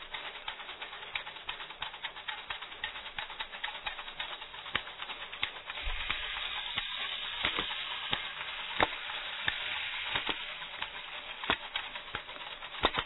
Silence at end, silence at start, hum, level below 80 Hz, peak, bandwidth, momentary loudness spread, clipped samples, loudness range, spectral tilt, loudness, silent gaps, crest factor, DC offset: 0 s; 0 s; none; -54 dBFS; -10 dBFS; 4.2 kHz; 9 LU; under 0.1%; 6 LU; -5 dB/octave; -36 LUFS; none; 28 dB; under 0.1%